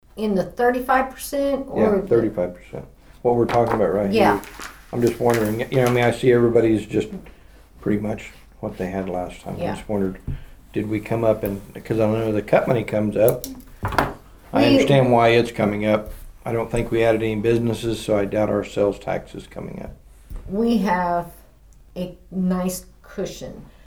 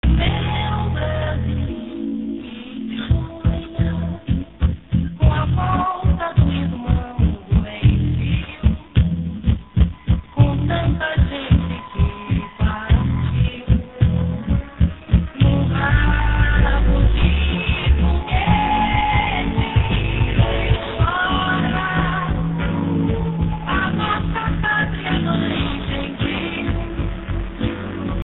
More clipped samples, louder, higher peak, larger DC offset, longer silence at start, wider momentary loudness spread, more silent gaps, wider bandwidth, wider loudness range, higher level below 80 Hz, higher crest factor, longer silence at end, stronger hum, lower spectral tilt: neither; about the same, -21 LUFS vs -20 LUFS; about the same, 0 dBFS vs -2 dBFS; about the same, 0.2% vs 0.2%; about the same, 0.15 s vs 0.05 s; first, 17 LU vs 7 LU; neither; first, over 20 kHz vs 4.1 kHz; about the same, 7 LU vs 5 LU; second, -42 dBFS vs -24 dBFS; about the same, 20 dB vs 16 dB; first, 0.2 s vs 0 s; neither; second, -6.5 dB/octave vs -11.5 dB/octave